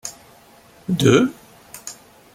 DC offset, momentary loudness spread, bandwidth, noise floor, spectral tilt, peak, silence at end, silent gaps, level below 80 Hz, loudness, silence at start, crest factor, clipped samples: under 0.1%; 21 LU; 16.5 kHz; -49 dBFS; -5.5 dB/octave; -2 dBFS; 0.4 s; none; -54 dBFS; -18 LUFS; 0.05 s; 20 dB; under 0.1%